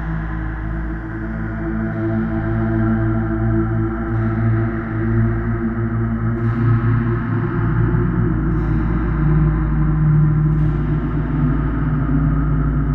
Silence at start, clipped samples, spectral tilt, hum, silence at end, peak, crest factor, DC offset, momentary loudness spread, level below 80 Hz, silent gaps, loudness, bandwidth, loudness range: 0 s; under 0.1%; -11.5 dB/octave; none; 0 s; -6 dBFS; 12 dB; under 0.1%; 8 LU; -24 dBFS; none; -19 LUFS; 3.3 kHz; 3 LU